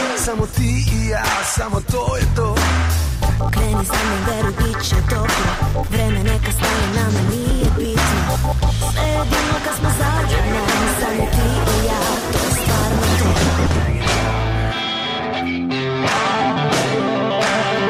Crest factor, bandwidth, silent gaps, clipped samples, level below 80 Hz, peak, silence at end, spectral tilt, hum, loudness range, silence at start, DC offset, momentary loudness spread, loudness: 12 dB; 16 kHz; none; under 0.1%; -24 dBFS; -6 dBFS; 0 s; -4.5 dB/octave; none; 1 LU; 0 s; under 0.1%; 3 LU; -18 LUFS